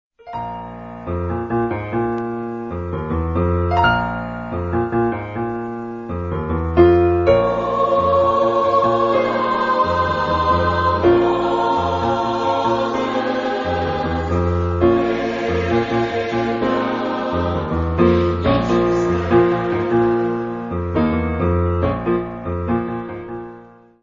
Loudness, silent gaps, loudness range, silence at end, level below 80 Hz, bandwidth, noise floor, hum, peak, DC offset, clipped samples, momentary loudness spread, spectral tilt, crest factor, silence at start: -19 LUFS; none; 5 LU; 0.35 s; -36 dBFS; 7.4 kHz; -43 dBFS; none; 0 dBFS; under 0.1%; under 0.1%; 11 LU; -8 dB/octave; 18 dB; 0.25 s